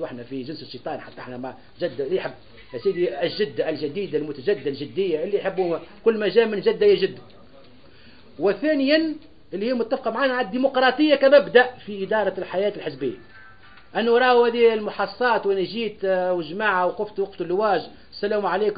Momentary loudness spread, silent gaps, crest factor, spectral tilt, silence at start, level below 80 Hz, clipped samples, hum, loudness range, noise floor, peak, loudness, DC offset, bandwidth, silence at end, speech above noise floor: 15 LU; none; 20 dB; -9.5 dB/octave; 0 s; -60 dBFS; under 0.1%; none; 6 LU; -50 dBFS; -2 dBFS; -22 LUFS; 0.4%; 5 kHz; 0 s; 28 dB